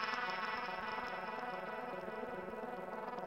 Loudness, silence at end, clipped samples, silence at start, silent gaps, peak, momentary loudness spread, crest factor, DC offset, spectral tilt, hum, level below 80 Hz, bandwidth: -42 LUFS; 0 s; under 0.1%; 0 s; none; -24 dBFS; 6 LU; 20 dB; under 0.1%; -4.5 dB/octave; none; -70 dBFS; 16 kHz